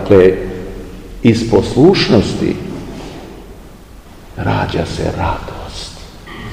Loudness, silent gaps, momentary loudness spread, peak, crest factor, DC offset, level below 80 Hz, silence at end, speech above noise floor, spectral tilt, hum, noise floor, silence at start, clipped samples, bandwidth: -14 LUFS; none; 23 LU; 0 dBFS; 16 dB; 0.2%; -32 dBFS; 0 s; 24 dB; -6.5 dB/octave; none; -36 dBFS; 0 s; 0.5%; 15.5 kHz